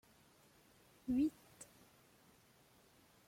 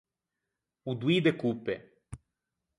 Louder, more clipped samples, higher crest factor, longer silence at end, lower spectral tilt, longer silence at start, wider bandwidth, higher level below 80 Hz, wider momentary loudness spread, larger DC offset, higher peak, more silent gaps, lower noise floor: second, -40 LUFS vs -30 LUFS; neither; about the same, 18 dB vs 22 dB; first, 1.65 s vs 0.65 s; second, -5.5 dB/octave vs -7 dB/octave; first, 1.05 s vs 0.85 s; first, 16.5 kHz vs 11 kHz; second, -72 dBFS vs -62 dBFS; about the same, 22 LU vs 24 LU; neither; second, -28 dBFS vs -12 dBFS; neither; second, -69 dBFS vs -87 dBFS